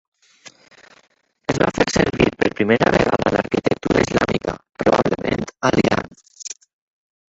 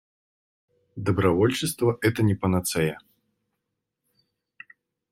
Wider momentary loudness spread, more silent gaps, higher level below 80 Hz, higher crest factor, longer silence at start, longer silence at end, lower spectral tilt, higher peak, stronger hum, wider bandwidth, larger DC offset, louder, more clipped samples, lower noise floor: first, 15 LU vs 9 LU; neither; first, -42 dBFS vs -58 dBFS; about the same, 18 dB vs 20 dB; first, 1.5 s vs 0.95 s; second, 0.85 s vs 2.15 s; about the same, -5.5 dB/octave vs -5.5 dB/octave; first, -2 dBFS vs -6 dBFS; neither; second, 8.2 kHz vs 16.5 kHz; neither; first, -19 LUFS vs -24 LUFS; neither; second, -47 dBFS vs -82 dBFS